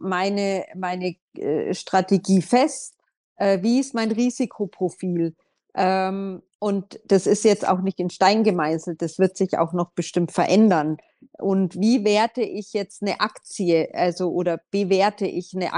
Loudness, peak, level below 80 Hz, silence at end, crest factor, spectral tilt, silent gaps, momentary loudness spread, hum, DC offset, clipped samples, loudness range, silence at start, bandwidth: -22 LUFS; -2 dBFS; -70 dBFS; 0 s; 20 dB; -5.5 dB/octave; 1.22-1.28 s, 3.17-3.36 s, 6.55-6.59 s; 10 LU; none; under 0.1%; under 0.1%; 3 LU; 0 s; 11 kHz